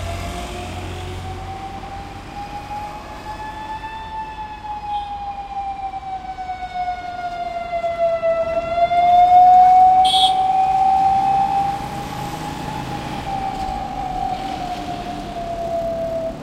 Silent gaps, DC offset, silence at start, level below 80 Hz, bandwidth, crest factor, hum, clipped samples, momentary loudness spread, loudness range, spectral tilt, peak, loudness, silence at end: none; under 0.1%; 0 s; -40 dBFS; 14 kHz; 16 dB; none; under 0.1%; 18 LU; 17 LU; -4.5 dB/octave; -2 dBFS; -19 LUFS; 0 s